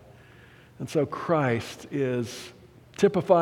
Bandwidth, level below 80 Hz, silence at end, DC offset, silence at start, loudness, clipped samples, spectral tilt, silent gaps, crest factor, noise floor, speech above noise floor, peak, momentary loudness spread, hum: 16.5 kHz; -64 dBFS; 0 s; under 0.1%; 0.8 s; -27 LUFS; under 0.1%; -6.5 dB/octave; none; 20 dB; -52 dBFS; 27 dB; -6 dBFS; 16 LU; none